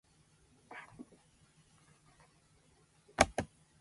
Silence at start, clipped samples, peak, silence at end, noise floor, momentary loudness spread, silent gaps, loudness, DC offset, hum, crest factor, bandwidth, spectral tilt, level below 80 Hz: 0.7 s; under 0.1%; -8 dBFS; 0.35 s; -68 dBFS; 24 LU; none; -35 LUFS; under 0.1%; none; 34 dB; 11.5 kHz; -3 dB/octave; -58 dBFS